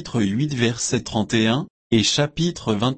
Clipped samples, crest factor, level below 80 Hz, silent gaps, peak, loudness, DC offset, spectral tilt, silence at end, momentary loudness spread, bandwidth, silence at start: under 0.1%; 14 dB; -48 dBFS; 1.70-1.90 s; -6 dBFS; -21 LUFS; under 0.1%; -4.5 dB/octave; 0 s; 5 LU; 8.8 kHz; 0 s